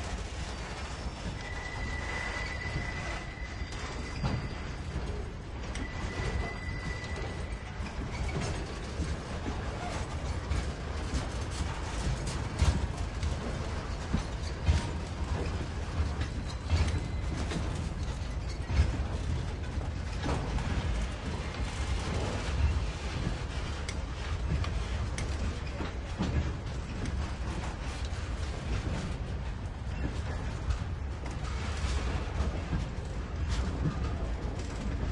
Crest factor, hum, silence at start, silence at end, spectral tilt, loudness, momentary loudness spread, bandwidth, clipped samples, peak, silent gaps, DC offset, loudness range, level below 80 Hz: 20 dB; none; 0 s; 0 s; -5.5 dB/octave; -35 LUFS; 6 LU; 11 kHz; under 0.1%; -14 dBFS; none; under 0.1%; 3 LU; -36 dBFS